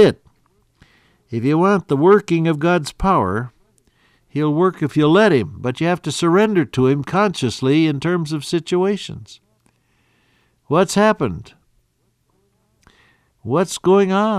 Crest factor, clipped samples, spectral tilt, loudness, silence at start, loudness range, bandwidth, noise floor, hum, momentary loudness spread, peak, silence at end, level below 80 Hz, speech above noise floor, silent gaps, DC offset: 16 dB; under 0.1%; -6 dB/octave; -17 LUFS; 0 s; 6 LU; 13.5 kHz; -65 dBFS; none; 12 LU; -2 dBFS; 0 s; -46 dBFS; 48 dB; none; under 0.1%